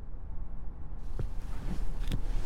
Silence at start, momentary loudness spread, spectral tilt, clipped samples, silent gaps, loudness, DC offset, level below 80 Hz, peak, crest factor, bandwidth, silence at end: 0 s; 8 LU; -6.5 dB/octave; under 0.1%; none; -42 LUFS; under 0.1%; -34 dBFS; -18 dBFS; 12 dB; 10.5 kHz; 0 s